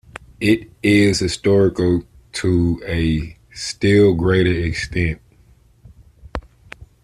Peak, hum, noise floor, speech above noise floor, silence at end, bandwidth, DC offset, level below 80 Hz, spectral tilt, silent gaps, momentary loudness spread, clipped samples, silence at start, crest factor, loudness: -2 dBFS; none; -52 dBFS; 35 dB; 0.2 s; 13.5 kHz; under 0.1%; -38 dBFS; -6 dB/octave; none; 18 LU; under 0.1%; 0.15 s; 16 dB; -18 LUFS